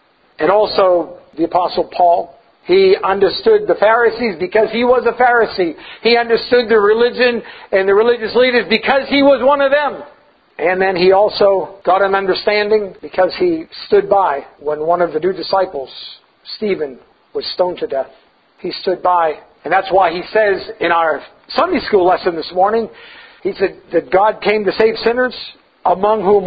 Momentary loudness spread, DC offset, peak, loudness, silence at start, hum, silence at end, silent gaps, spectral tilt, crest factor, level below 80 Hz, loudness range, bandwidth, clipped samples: 11 LU; under 0.1%; 0 dBFS; -14 LUFS; 0.4 s; none; 0 s; none; -8 dB/octave; 14 dB; -50 dBFS; 6 LU; 5 kHz; under 0.1%